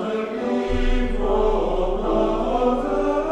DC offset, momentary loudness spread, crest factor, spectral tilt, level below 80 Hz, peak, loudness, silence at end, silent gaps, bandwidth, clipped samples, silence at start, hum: under 0.1%; 4 LU; 12 dB; -7 dB/octave; -26 dBFS; -8 dBFS; -22 LUFS; 0 s; none; 8.4 kHz; under 0.1%; 0 s; none